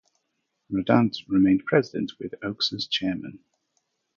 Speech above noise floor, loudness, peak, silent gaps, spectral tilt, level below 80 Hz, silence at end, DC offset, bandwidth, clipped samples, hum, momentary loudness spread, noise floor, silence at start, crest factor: 53 dB; -24 LUFS; -4 dBFS; none; -6.5 dB/octave; -58 dBFS; 0.8 s; under 0.1%; 7.2 kHz; under 0.1%; none; 12 LU; -77 dBFS; 0.7 s; 22 dB